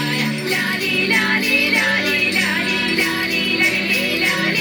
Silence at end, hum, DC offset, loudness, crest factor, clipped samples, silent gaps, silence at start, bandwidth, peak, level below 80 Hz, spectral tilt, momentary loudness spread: 0 s; none; under 0.1%; -16 LUFS; 14 dB; under 0.1%; none; 0 s; over 20 kHz; -4 dBFS; -56 dBFS; -3 dB/octave; 4 LU